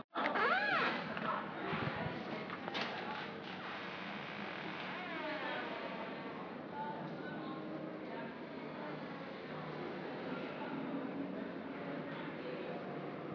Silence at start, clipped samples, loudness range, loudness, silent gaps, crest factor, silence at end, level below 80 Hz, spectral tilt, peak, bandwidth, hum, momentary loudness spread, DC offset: 0.15 s; under 0.1%; 7 LU; -41 LUFS; none; 20 dB; 0 s; -76 dBFS; -3 dB/octave; -20 dBFS; 5.4 kHz; none; 10 LU; under 0.1%